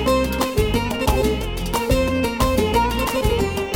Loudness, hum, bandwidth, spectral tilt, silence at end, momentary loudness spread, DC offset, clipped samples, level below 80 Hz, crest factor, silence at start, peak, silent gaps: -20 LUFS; none; over 20 kHz; -5 dB/octave; 0 s; 3 LU; under 0.1%; under 0.1%; -26 dBFS; 16 dB; 0 s; -4 dBFS; none